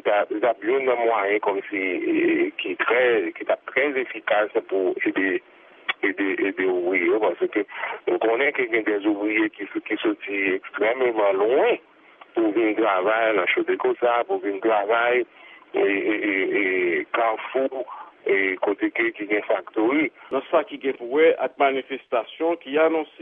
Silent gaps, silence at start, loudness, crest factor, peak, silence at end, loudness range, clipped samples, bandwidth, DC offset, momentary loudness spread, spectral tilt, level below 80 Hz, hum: none; 0.05 s; -23 LUFS; 16 dB; -8 dBFS; 0.15 s; 2 LU; under 0.1%; 3.8 kHz; under 0.1%; 7 LU; -8 dB/octave; -80 dBFS; none